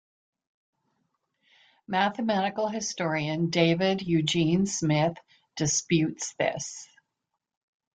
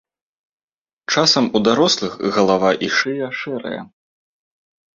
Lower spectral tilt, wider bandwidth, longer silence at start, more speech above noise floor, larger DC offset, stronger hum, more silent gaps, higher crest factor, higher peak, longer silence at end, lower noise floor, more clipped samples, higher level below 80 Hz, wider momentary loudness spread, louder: about the same, -4.5 dB/octave vs -3.5 dB/octave; first, 9.4 kHz vs 7.8 kHz; first, 1.9 s vs 1.1 s; second, 57 dB vs over 72 dB; neither; neither; neither; about the same, 20 dB vs 18 dB; second, -8 dBFS vs -2 dBFS; about the same, 1.1 s vs 1.1 s; second, -84 dBFS vs under -90 dBFS; neither; second, -64 dBFS vs -58 dBFS; second, 7 LU vs 13 LU; second, -27 LUFS vs -17 LUFS